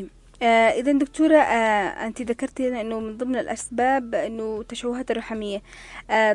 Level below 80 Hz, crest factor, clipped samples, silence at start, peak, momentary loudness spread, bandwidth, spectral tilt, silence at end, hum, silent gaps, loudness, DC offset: -52 dBFS; 18 dB; under 0.1%; 0 s; -4 dBFS; 12 LU; 11 kHz; -4 dB/octave; 0 s; none; none; -23 LUFS; under 0.1%